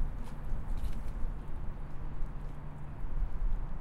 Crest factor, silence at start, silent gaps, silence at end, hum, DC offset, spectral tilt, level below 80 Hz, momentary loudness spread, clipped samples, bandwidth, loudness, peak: 12 dB; 0 s; none; 0 s; none; under 0.1%; -7.5 dB/octave; -36 dBFS; 6 LU; under 0.1%; 4.2 kHz; -43 LUFS; -20 dBFS